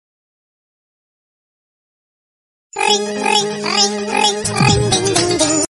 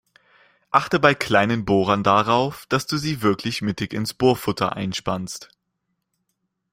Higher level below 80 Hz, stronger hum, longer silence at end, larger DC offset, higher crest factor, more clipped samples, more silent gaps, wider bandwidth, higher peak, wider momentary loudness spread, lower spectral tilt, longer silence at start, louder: first, -42 dBFS vs -54 dBFS; neither; second, 0.05 s vs 1.3 s; neither; about the same, 18 dB vs 22 dB; neither; neither; second, 11.5 kHz vs 16 kHz; about the same, 0 dBFS vs 0 dBFS; second, 2 LU vs 9 LU; second, -3 dB/octave vs -5 dB/octave; first, 2.75 s vs 0.7 s; first, -15 LUFS vs -21 LUFS